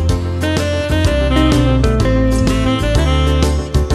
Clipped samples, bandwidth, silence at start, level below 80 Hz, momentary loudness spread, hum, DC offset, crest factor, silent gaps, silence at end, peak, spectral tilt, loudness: under 0.1%; 14 kHz; 0 s; -18 dBFS; 4 LU; none; under 0.1%; 12 dB; none; 0 s; 0 dBFS; -6 dB/octave; -15 LUFS